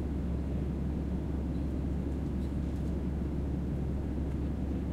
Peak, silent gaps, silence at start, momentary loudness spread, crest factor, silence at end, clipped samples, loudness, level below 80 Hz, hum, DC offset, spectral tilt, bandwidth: -22 dBFS; none; 0 s; 1 LU; 12 dB; 0 s; under 0.1%; -35 LUFS; -36 dBFS; none; under 0.1%; -9.5 dB/octave; 7.6 kHz